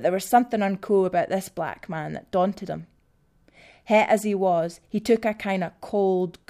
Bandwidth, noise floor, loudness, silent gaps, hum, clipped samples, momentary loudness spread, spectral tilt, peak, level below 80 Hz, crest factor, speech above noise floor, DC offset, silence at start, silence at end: 15.5 kHz; -63 dBFS; -24 LUFS; none; none; under 0.1%; 11 LU; -6 dB/octave; -4 dBFS; -62 dBFS; 20 dB; 39 dB; under 0.1%; 0 s; 0.2 s